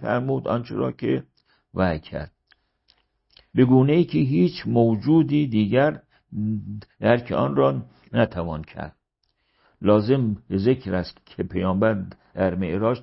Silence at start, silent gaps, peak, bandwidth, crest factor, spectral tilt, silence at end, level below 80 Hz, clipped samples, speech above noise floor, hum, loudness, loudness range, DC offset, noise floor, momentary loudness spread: 0 s; none; -4 dBFS; 5.8 kHz; 18 dB; -12 dB/octave; 0 s; -50 dBFS; under 0.1%; 51 dB; none; -22 LUFS; 5 LU; under 0.1%; -73 dBFS; 16 LU